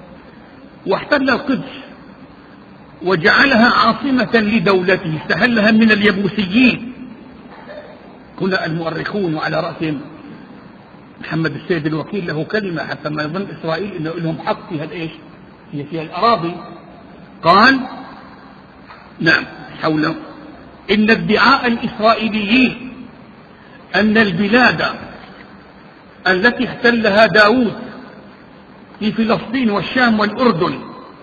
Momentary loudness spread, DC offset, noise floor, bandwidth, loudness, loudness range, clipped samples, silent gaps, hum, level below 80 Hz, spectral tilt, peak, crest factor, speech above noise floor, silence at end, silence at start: 21 LU; under 0.1%; -41 dBFS; 7 kHz; -15 LUFS; 8 LU; under 0.1%; none; none; -50 dBFS; -6.5 dB/octave; 0 dBFS; 18 dB; 26 dB; 0 s; 0 s